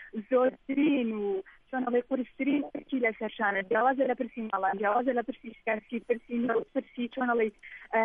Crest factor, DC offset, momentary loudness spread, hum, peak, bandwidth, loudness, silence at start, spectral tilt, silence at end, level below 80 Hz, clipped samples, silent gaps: 16 dB; under 0.1%; 8 LU; none; -14 dBFS; 3.8 kHz; -30 LUFS; 0 s; -8.5 dB/octave; 0 s; -66 dBFS; under 0.1%; none